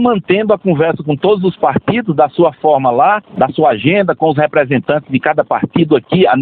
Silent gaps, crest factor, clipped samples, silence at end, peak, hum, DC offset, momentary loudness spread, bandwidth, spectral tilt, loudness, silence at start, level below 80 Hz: none; 12 dB; under 0.1%; 0 s; 0 dBFS; none; under 0.1%; 4 LU; 4.5 kHz; -11 dB/octave; -13 LUFS; 0 s; -50 dBFS